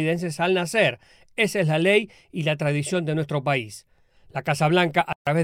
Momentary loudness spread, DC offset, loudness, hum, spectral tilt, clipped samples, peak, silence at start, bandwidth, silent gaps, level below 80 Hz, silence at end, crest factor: 15 LU; under 0.1%; -23 LUFS; none; -5.5 dB/octave; under 0.1%; -6 dBFS; 0 s; 15 kHz; 5.15-5.25 s; -62 dBFS; 0 s; 18 dB